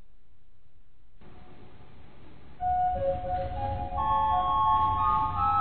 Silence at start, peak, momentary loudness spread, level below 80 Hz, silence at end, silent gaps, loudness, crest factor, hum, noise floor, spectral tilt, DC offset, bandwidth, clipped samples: 1.25 s; -14 dBFS; 8 LU; -44 dBFS; 0 s; none; -27 LUFS; 14 dB; none; -60 dBFS; -9.5 dB/octave; 1%; 4.5 kHz; under 0.1%